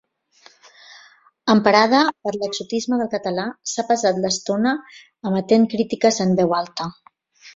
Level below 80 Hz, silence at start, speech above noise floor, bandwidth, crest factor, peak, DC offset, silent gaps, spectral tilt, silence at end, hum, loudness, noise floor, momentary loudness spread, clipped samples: -62 dBFS; 0.9 s; 34 dB; 7.8 kHz; 20 dB; 0 dBFS; under 0.1%; none; -4.5 dB/octave; 0.05 s; none; -20 LUFS; -53 dBFS; 12 LU; under 0.1%